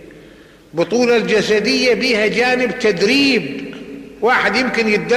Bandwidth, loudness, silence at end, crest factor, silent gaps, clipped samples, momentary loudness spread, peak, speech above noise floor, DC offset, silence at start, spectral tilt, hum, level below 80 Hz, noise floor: 14.5 kHz; -15 LUFS; 0 s; 12 dB; none; under 0.1%; 14 LU; -4 dBFS; 28 dB; under 0.1%; 0 s; -4 dB/octave; none; -50 dBFS; -43 dBFS